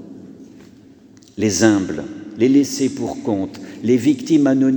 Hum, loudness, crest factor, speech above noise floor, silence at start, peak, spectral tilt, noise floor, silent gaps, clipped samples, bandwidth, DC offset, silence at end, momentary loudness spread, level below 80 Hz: none; -18 LUFS; 18 dB; 29 dB; 0 s; 0 dBFS; -5 dB/octave; -46 dBFS; none; under 0.1%; over 20 kHz; under 0.1%; 0 s; 16 LU; -58 dBFS